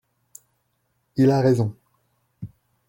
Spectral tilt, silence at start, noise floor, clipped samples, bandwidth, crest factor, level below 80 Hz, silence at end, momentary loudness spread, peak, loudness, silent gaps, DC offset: -8 dB/octave; 1.15 s; -71 dBFS; under 0.1%; 16.5 kHz; 18 dB; -60 dBFS; 0.4 s; 24 LU; -6 dBFS; -21 LUFS; none; under 0.1%